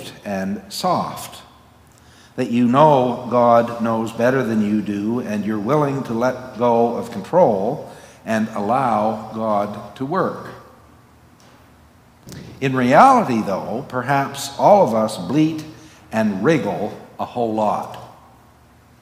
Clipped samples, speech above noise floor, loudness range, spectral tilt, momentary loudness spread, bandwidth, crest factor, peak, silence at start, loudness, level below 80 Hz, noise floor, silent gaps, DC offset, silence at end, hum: under 0.1%; 32 dB; 6 LU; -6.5 dB/octave; 16 LU; 16 kHz; 20 dB; 0 dBFS; 0 s; -19 LUFS; -58 dBFS; -50 dBFS; none; under 0.1%; 0.9 s; none